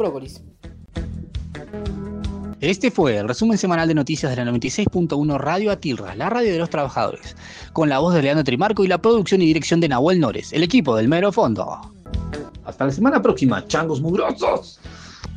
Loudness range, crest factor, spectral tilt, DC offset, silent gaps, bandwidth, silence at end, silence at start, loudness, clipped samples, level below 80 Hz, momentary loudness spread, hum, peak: 4 LU; 16 dB; -6 dB/octave; under 0.1%; none; 10 kHz; 0 s; 0 s; -19 LUFS; under 0.1%; -40 dBFS; 16 LU; none; -4 dBFS